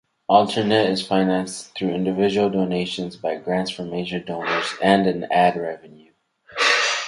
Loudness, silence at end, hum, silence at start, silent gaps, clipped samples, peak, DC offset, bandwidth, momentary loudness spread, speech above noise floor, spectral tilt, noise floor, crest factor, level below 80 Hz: -21 LUFS; 0 s; none; 0.3 s; none; under 0.1%; 0 dBFS; under 0.1%; 11.5 kHz; 10 LU; 22 dB; -4.5 dB/octave; -43 dBFS; 20 dB; -60 dBFS